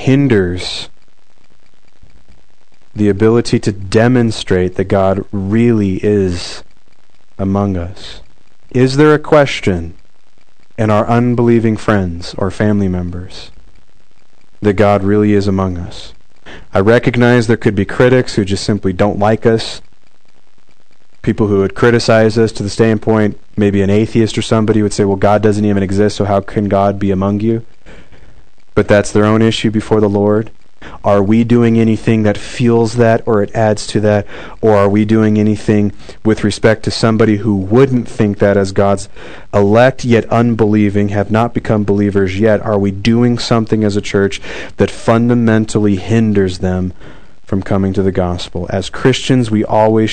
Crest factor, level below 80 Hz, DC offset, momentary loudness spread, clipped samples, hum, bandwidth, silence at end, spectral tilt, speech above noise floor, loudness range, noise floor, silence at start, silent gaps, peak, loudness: 14 dB; -40 dBFS; 4%; 9 LU; 0.7%; none; 9.4 kHz; 0 s; -7 dB/octave; 43 dB; 4 LU; -55 dBFS; 0 s; none; 0 dBFS; -13 LUFS